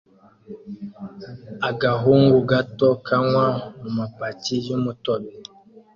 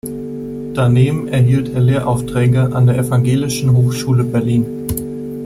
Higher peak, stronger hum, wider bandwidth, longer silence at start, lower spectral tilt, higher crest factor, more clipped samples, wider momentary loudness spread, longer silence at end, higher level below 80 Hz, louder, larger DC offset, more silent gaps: about the same, -4 dBFS vs -2 dBFS; neither; second, 7.4 kHz vs 15 kHz; first, 0.5 s vs 0.05 s; about the same, -7 dB/octave vs -7 dB/octave; first, 18 dB vs 12 dB; neither; first, 22 LU vs 10 LU; first, 0.55 s vs 0 s; second, -56 dBFS vs -40 dBFS; second, -21 LUFS vs -15 LUFS; neither; neither